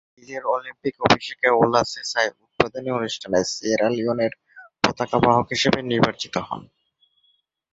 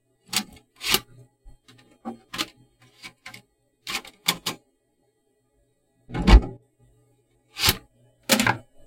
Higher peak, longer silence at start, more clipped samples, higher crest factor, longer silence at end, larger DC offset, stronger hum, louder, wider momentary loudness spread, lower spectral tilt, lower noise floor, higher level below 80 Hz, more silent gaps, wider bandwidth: about the same, 0 dBFS vs 0 dBFS; about the same, 0.3 s vs 0.3 s; neither; about the same, 22 dB vs 26 dB; first, 1.1 s vs 0.3 s; neither; neither; about the same, -22 LUFS vs -24 LUFS; second, 10 LU vs 24 LU; about the same, -4.5 dB/octave vs -3.5 dB/octave; second, -66 dBFS vs -70 dBFS; second, -54 dBFS vs -30 dBFS; neither; second, 8 kHz vs 16.5 kHz